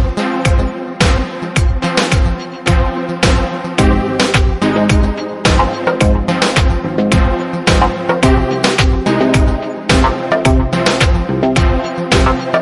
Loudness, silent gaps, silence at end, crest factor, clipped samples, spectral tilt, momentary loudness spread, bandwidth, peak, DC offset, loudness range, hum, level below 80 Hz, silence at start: -14 LUFS; none; 0 s; 12 dB; under 0.1%; -5.5 dB/octave; 4 LU; 11.5 kHz; 0 dBFS; under 0.1%; 2 LU; none; -18 dBFS; 0 s